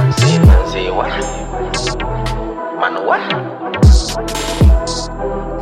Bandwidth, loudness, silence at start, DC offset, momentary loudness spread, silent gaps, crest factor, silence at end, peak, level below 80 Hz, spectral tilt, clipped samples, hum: 13.5 kHz; -15 LUFS; 0 s; under 0.1%; 11 LU; none; 14 dB; 0 s; 0 dBFS; -16 dBFS; -5.5 dB/octave; under 0.1%; none